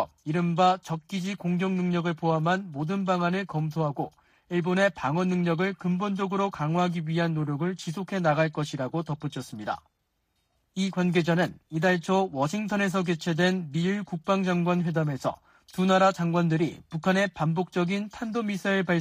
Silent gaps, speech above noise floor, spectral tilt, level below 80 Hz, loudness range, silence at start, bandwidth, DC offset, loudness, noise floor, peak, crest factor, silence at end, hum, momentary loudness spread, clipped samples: none; 49 dB; -6.5 dB/octave; -64 dBFS; 4 LU; 0 s; 14.5 kHz; under 0.1%; -27 LUFS; -75 dBFS; -10 dBFS; 16 dB; 0 s; none; 8 LU; under 0.1%